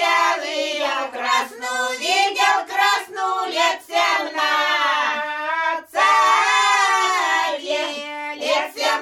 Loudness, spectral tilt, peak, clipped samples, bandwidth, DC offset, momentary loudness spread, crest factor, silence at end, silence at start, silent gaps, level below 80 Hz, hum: -19 LUFS; 1 dB/octave; -4 dBFS; under 0.1%; 17.5 kHz; under 0.1%; 8 LU; 16 dB; 0 s; 0 s; none; -68 dBFS; none